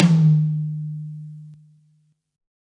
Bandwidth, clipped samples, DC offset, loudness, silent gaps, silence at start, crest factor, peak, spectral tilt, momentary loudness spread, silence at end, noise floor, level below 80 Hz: 7.2 kHz; under 0.1%; under 0.1%; -20 LUFS; none; 0 s; 20 dB; -2 dBFS; -8.5 dB/octave; 23 LU; 1.1 s; -63 dBFS; -66 dBFS